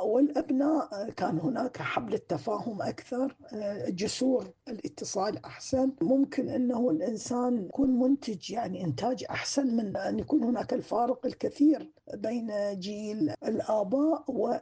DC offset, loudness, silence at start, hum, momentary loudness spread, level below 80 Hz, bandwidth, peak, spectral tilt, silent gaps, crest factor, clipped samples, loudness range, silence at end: under 0.1%; -30 LUFS; 0 s; none; 8 LU; -64 dBFS; 9.6 kHz; -14 dBFS; -5.5 dB/octave; none; 14 dB; under 0.1%; 4 LU; 0 s